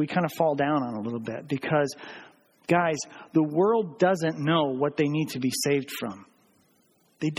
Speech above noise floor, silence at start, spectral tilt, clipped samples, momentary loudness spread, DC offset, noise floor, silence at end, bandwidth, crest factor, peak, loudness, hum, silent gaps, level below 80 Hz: 39 dB; 0 s; -5.5 dB/octave; under 0.1%; 11 LU; under 0.1%; -65 dBFS; 0 s; 16.5 kHz; 18 dB; -8 dBFS; -26 LUFS; none; none; -68 dBFS